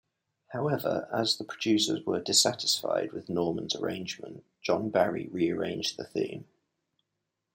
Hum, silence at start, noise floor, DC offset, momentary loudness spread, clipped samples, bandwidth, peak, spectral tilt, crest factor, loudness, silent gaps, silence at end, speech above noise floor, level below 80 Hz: none; 0.5 s; -84 dBFS; under 0.1%; 12 LU; under 0.1%; 16.5 kHz; -10 dBFS; -3.5 dB/octave; 22 dB; -29 LUFS; none; 1.1 s; 54 dB; -72 dBFS